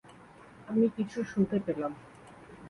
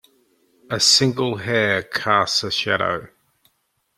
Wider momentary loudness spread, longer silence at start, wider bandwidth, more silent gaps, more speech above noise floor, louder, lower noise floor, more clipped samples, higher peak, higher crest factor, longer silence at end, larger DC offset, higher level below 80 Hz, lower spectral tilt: first, 23 LU vs 10 LU; second, 0.05 s vs 0.7 s; second, 11 kHz vs 15.5 kHz; neither; second, 24 dB vs 49 dB; second, -31 LUFS vs -18 LUFS; second, -53 dBFS vs -69 dBFS; neither; second, -16 dBFS vs -2 dBFS; about the same, 18 dB vs 20 dB; second, 0 s vs 0.9 s; neither; second, -66 dBFS vs -60 dBFS; first, -8 dB/octave vs -2.5 dB/octave